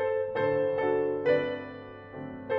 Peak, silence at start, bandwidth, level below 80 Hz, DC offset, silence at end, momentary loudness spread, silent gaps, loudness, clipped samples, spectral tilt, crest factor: -14 dBFS; 0 s; 5.4 kHz; -64 dBFS; under 0.1%; 0 s; 15 LU; none; -28 LUFS; under 0.1%; -8 dB/octave; 16 dB